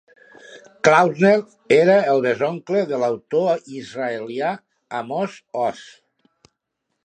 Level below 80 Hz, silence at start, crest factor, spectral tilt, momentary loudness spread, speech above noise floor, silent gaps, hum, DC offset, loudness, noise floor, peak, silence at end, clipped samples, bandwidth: -70 dBFS; 0.5 s; 20 dB; -5.5 dB/octave; 13 LU; 58 dB; none; none; under 0.1%; -19 LUFS; -77 dBFS; 0 dBFS; 1.2 s; under 0.1%; 9.6 kHz